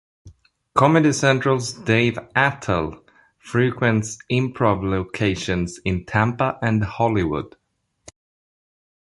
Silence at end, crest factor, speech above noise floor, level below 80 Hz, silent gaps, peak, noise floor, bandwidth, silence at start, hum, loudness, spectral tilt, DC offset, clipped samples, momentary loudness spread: 1.6 s; 20 dB; 30 dB; -44 dBFS; none; -2 dBFS; -50 dBFS; 11.5 kHz; 0.25 s; none; -21 LUFS; -5.5 dB/octave; under 0.1%; under 0.1%; 8 LU